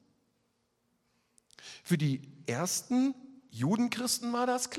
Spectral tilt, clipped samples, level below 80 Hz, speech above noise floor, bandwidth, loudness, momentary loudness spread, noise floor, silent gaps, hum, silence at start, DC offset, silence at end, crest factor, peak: -4.5 dB/octave; under 0.1%; -76 dBFS; 45 dB; 16 kHz; -31 LUFS; 17 LU; -76 dBFS; none; none; 1.65 s; under 0.1%; 0 s; 18 dB; -16 dBFS